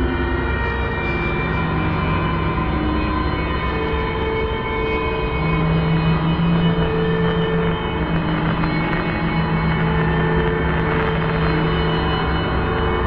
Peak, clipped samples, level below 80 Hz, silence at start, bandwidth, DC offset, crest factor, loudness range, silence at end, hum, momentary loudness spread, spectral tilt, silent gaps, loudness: -6 dBFS; under 0.1%; -28 dBFS; 0 s; 5.2 kHz; under 0.1%; 14 dB; 2 LU; 0 s; none; 3 LU; -9.5 dB/octave; none; -20 LUFS